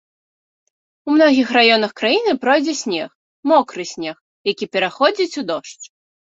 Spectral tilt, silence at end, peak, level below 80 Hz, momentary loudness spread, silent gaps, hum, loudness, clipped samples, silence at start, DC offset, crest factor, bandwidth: -3 dB/octave; 0.5 s; 0 dBFS; -66 dBFS; 15 LU; 3.15-3.43 s, 4.21-4.44 s; none; -17 LUFS; under 0.1%; 1.05 s; under 0.1%; 18 dB; 8 kHz